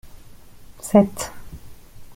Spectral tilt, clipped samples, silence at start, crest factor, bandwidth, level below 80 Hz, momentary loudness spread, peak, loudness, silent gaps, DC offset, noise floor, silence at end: -6.5 dB/octave; under 0.1%; 0.05 s; 22 dB; 16.5 kHz; -46 dBFS; 26 LU; -2 dBFS; -20 LUFS; none; under 0.1%; -42 dBFS; 0 s